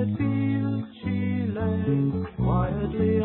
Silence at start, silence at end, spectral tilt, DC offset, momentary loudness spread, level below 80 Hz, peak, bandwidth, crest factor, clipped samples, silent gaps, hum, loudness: 0 s; 0 s; -13 dB/octave; under 0.1%; 4 LU; -38 dBFS; -12 dBFS; 4.2 kHz; 12 dB; under 0.1%; none; none; -26 LUFS